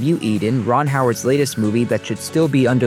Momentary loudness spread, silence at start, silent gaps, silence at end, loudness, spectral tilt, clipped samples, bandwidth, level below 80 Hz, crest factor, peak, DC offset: 4 LU; 0 s; none; 0 s; -18 LUFS; -6 dB/octave; under 0.1%; 16 kHz; -60 dBFS; 14 dB; -4 dBFS; under 0.1%